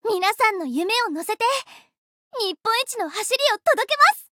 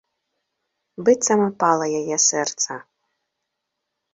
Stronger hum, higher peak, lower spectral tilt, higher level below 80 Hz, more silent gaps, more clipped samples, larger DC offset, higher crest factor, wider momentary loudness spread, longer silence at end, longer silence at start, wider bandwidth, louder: neither; about the same, -4 dBFS vs -4 dBFS; second, 0 dB/octave vs -2.5 dB/octave; second, -78 dBFS vs -70 dBFS; first, 1.98-2.31 s vs none; neither; neither; about the same, 18 dB vs 20 dB; about the same, 10 LU vs 8 LU; second, 0.1 s vs 1.3 s; second, 0.05 s vs 1 s; first, 19.5 kHz vs 8 kHz; about the same, -21 LUFS vs -19 LUFS